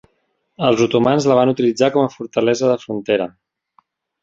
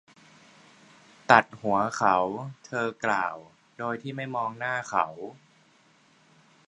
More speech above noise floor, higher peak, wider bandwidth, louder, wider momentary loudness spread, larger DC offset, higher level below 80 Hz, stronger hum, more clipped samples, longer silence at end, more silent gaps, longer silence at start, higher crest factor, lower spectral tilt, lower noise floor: first, 51 dB vs 34 dB; about the same, -2 dBFS vs 0 dBFS; second, 7.8 kHz vs 11 kHz; first, -17 LUFS vs -27 LUFS; second, 6 LU vs 17 LU; neither; first, -58 dBFS vs -70 dBFS; neither; neither; second, 0.95 s vs 1.35 s; neither; second, 0.6 s vs 1.3 s; second, 16 dB vs 28 dB; about the same, -5.5 dB/octave vs -5 dB/octave; first, -67 dBFS vs -61 dBFS